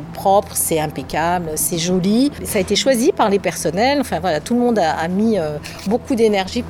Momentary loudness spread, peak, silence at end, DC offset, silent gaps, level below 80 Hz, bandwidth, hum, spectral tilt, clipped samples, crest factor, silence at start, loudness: 5 LU; -2 dBFS; 0 s; under 0.1%; none; -44 dBFS; 19.5 kHz; none; -4.5 dB/octave; under 0.1%; 14 dB; 0 s; -17 LUFS